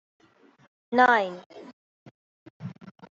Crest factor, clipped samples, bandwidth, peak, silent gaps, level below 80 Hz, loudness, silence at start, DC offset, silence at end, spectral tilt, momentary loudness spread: 24 dB; under 0.1%; 7.6 kHz; -6 dBFS; 1.46-1.50 s, 1.73-2.60 s; -76 dBFS; -22 LUFS; 0.9 s; under 0.1%; 0.4 s; -2.5 dB/octave; 26 LU